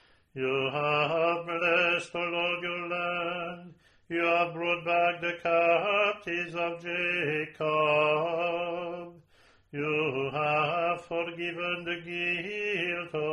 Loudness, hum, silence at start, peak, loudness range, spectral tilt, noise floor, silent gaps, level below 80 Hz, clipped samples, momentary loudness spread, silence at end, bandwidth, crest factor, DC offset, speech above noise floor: -29 LUFS; none; 0.35 s; -12 dBFS; 3 LU; -5.5 dB/octave; -62 dBFS; none; -70 dBFS; under 0.1%; 9 LU; 0 s; 11 kHz; 18 dB; under 0.1%; 33 dB